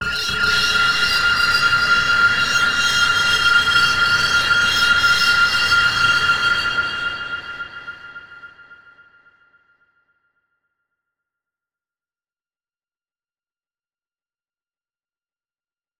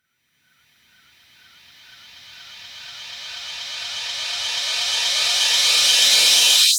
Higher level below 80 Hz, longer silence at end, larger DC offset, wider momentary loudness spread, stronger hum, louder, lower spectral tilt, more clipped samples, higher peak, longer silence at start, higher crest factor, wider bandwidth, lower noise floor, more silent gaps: first, -46 dBFS vs -66 dBFS; first, 7.1 s vs 0 s; neither; second, 13 LU vs 24 LU; neither; about the same, -15 LUFS vs -15 LUFS; first, -1 dB/octave vs 3.5 dB/octave; neither; about the same, -2 dBFS vs -2 dBFS; second, 0 s vs 2.25 s; about the same, 18 dB vs 20 dB; about the same, over 20 kHz vs over 20 kHz; first, under -90 dBFS vs -67 dBFS; neither